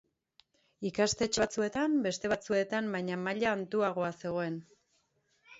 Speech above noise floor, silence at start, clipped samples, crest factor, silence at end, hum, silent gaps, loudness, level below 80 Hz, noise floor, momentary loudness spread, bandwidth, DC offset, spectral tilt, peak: 43 dB; 0.8 s; under 0.1%; 18 dB; 0 s; none; none; -32 LUFS; -64 dBFS; -75 dBFS; 6 LU; 8 kHz; under 0.1%; -4 dB/octave; -16 dBFS